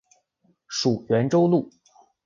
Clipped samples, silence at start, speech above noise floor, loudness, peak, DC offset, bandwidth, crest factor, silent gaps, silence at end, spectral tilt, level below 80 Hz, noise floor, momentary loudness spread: under 0.1%; 0.7 s; 46 dB; -22 LUFS; -8 dBFS; under 0.1%; 7.6 kHz; 16 dB; none; 0.6 s; -6 dB/octave; -64 dBFS; -67 dBFS; 11 LU